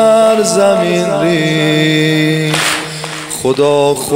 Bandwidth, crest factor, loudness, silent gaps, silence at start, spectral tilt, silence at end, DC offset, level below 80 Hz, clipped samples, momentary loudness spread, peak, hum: 16.5 kHz; 12 dB; -12 LUFS; none; 0 s; -4.5 dB/octave; 0 s; under 0.1%; -54 dBFS; under 0.1%; 7 LU; 0 dBFS; none